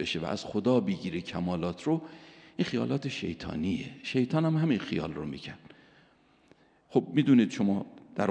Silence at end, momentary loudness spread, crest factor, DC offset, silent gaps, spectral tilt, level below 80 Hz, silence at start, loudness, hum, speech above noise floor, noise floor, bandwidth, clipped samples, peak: 0 s; 14 LU; 20 dB; under 0.1%; none; -7 dB/octave; -60 dBFS; 0 s; -30 LUFS; none; 34 dB; -63 dBFS; 9.4 kHz; under 0.1%; -10 dBFS